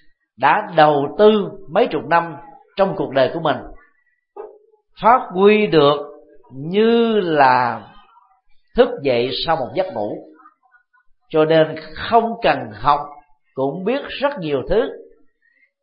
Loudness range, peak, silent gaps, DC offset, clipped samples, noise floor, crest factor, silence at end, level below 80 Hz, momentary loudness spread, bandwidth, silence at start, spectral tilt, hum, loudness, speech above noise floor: 5 LU; 0 dBFS; none; under 0.1%; under 0.1%; -63 dBFS; 18 dB; 0.8 s; -44 dBFS; 14 LU; 5.4 kHz; 0.4 s; -10.5 dB/octave; none; -17 LUFS; 46 dB